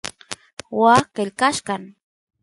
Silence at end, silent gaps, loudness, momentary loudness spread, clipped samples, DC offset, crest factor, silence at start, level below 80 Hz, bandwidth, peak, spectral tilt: 0.55 s; 0.53-0.57 s; -19 LUFS; 19 LU; under 0.1%; under 0.1%; 20 dB; 0.05 s; -60 dBFS; 11.5 kHz; -2 dBFS; -4 dB/octave